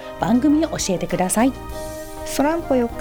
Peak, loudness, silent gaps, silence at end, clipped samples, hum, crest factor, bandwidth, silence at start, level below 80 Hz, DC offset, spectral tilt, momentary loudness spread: -4 dBFS; -20 LUFS; none; 0 s; under 0.1%; none; 16 dB; over 20 kHz; 0 s; -38 dBFS; under 0.1%; -4.5 dB/octave; 14 LU